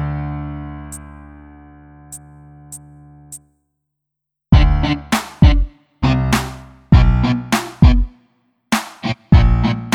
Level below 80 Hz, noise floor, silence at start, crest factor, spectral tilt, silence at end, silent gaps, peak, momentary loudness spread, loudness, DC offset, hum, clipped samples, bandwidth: -20 dBFS; -80 dBFS; 0 s; 16 dB; -6 dB/octave; 0 s; none; 0 dBFS; 23 LU; -16 LUFS; under 0.1%; none; under 0.1%; 16 kHz